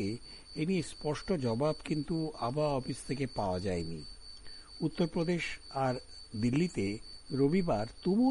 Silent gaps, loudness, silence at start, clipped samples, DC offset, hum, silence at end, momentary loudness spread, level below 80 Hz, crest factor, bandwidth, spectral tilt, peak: none; -34 LUFS; 0 s; under 0.1%; under 0.1%; none; 0 s; 13 LU; -54 dBFS; 16 dB; 11.5 kHz; -6.5 dB/octave; -18 dBFS